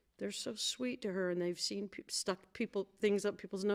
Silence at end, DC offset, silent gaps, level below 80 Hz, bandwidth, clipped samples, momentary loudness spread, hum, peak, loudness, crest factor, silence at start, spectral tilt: 0 s; under 0.1%; none; -76 dBFS; 16 kHz; under 0.1%; 6 LU; none; -20 dBFS; -38 LUFS; 18 dB; 0.2 s; -3.5 dB/octave